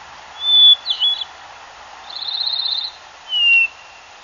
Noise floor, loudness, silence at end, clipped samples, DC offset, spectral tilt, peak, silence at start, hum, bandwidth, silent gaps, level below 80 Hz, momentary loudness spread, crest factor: -41 dBFS; -13 LUFS; 0.55 s; under 0.1%; under 0.1%; 2 dB/octave; -4 dBFS; 0 s; none; 7.4 kHz; none; -62 dBFS; 18 LU; 16 dB